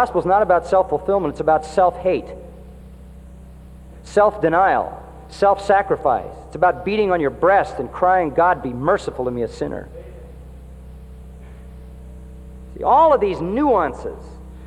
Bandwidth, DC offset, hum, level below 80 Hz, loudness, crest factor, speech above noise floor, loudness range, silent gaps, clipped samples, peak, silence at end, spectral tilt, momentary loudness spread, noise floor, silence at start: 11.5 kHz; under 0.1%; none; -40 dBFS; -18 LUFS; 16 dB; 22 dB; 8 LU; none; under 0.1%; -4 dBFS; 0 s; -6.5 dB/octave; 24 LU; -40 dBFS; 0 s